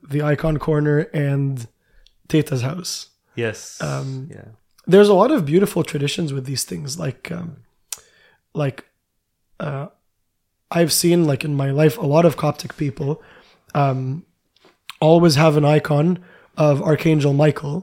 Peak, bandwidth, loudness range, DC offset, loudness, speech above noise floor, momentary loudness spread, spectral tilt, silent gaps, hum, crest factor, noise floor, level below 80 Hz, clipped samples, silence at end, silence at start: 0 dBFS; 16.5 kHz; 11 LU; under 0.1%; -19 LUFS; 54 dB; 17 LU; -6 dB/octave; none; none; 18 dB; -72 dBFS; -48 dBFS; under 0.1%; 0 s; 0.1 s